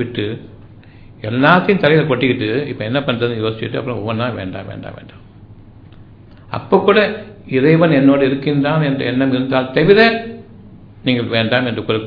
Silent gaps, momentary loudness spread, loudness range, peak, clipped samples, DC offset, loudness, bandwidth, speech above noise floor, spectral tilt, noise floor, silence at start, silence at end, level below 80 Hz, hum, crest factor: none; 17 LU; 9 LU; 0 dBFS; under 0.1%; under 0.1%; -15 LUFS; 5.2 kHz; 25 dB; -9 dB/octave; -40 dBFS; 0 s; 0 s; -46 dBFS; none; 16 dB